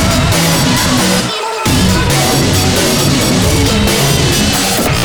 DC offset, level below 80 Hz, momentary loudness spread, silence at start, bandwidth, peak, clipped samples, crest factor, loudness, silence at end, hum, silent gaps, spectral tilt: under 0.1%; -24 dBFS; 1 LU; 0 s; over 20 kHz; 0 dBFS; under 0.1%; 10 dB; -10 LUFS; 0 s; none; none; -4 dB/octave